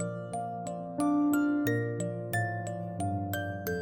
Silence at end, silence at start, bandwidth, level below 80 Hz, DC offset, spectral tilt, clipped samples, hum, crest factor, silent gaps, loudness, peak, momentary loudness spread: 0 s; 0 s; 17 kHz; -68 dBFS; under 0.1%; -6.5 dB/octave; under 0.1%; none; 14 dB; none; -32 LUFS; -18 dBFS; 10 LU